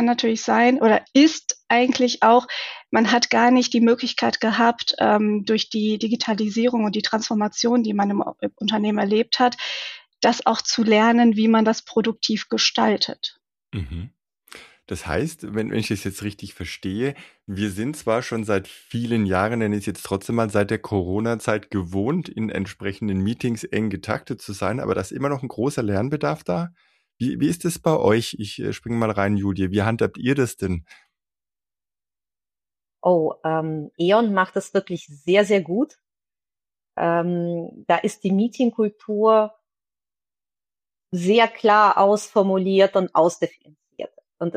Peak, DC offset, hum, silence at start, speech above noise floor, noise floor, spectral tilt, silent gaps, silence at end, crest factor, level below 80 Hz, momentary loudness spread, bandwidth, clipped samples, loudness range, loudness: -4 dBFS; under 0.1%; none; 0 s; over 69 dB; under -90 dBFS; -5 dB/octave; none; 0.05 s; 16 dB; -54 dBFS; 13 LU; 13.5 kHz; under 0.1%; 8 LU; -21 LUFS